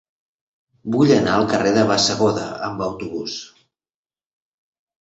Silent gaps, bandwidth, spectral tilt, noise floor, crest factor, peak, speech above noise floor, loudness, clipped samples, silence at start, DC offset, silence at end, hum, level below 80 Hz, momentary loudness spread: none; 8.2 kHz; -4.5 dB/octave; under -90 dBFS; 18 dB; -2 dBFS; over 72 dB; -19 LUFS; under 0.1%; 0.85 s; under 0.1%; 1.55 s; none; -54 dBFS; 13 LU